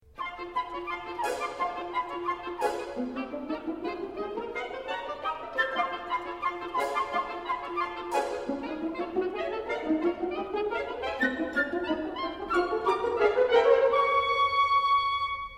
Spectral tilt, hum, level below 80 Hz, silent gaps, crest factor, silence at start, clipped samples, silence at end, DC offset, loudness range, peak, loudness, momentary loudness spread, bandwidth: -4 dB/octave; none; -58 dBFS; none; 18 dB; 0.15 s; under 0.1%; 0 s; under 0.1%; 8 LU; -10 dBFS; -29 LUFS; 11 LU; 15.5 kHz